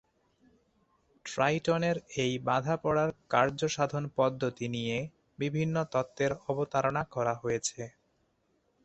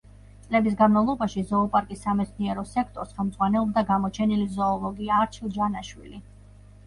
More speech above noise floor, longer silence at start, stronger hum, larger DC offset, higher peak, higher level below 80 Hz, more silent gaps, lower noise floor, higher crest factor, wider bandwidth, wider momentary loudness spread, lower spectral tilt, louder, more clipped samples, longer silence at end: first, 43 dB vs 24 dB; first, 1.25 s vs 0.5 s; neither; neither; about the same, -10 dBFS vs -8 dBFS; second, -62 dBFS vs -48 dBFS; neither; first, -74 dBFS vs -49 dBFS; about the same, 22 dB vs 18 dB; second, 8.4 kHz vs 11 kHz; second, 8 LU vs 11 LU; second, -5 dB/octave vs -7 dB/octave; second, -31 LUFS vs -25 LUFS; neither; first, 0.95 s vs 0.65 s